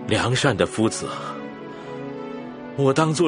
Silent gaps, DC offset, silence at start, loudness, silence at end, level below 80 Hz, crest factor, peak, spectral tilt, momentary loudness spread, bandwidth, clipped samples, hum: none; under 0.1%; 0 s; -23 LUFS; 0 s; -54 dBFS; 22 dB; -2 dBFS; -5 dB/octave; 15 LU; 10.5 kHz; under 0.1%; none